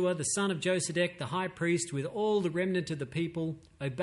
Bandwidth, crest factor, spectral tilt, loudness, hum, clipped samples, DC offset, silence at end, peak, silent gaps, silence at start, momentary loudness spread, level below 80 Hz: 11.5 kHz; 14 dB; -4.5 dB/octave; -32 LUFS; none; under 0.1%; under 0.1%; 0 s; -16 dBFS; none; 0 s; 7 LU; -64 dBFS